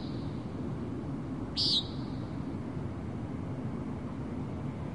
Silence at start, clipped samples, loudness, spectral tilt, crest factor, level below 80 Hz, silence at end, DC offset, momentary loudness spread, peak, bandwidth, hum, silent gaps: 0 s; under 0.1%; -35 LUFS; -6 dB/octave; 20 dB; -52 dBFS; 0 s; 0.2%; 10 LU; -16 dBFS; 11 kHz; none; none